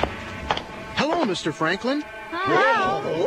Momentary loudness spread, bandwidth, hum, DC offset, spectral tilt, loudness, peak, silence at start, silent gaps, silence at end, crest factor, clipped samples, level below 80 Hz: 10 LU; 13.5 kHz; none; under 0.1%; -4.5 dB/octave; -23 LUFS; -6 dBFS; 0 s; none; 0 s; 18 dB; under 0.1%; -46 dBFS